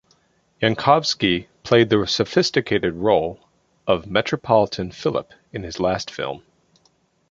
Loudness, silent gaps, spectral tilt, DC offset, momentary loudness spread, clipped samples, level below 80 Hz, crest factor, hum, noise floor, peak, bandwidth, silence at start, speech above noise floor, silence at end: -20 LUFS; none; -5 dB/octave; under 0.1%; 13 LU; under 0.1%; -50 dBFS; 20 dB; none; -63 dBFS; -2 dBFS; 7.8 kHz; 0.6 s; 43 dB; 0.9 s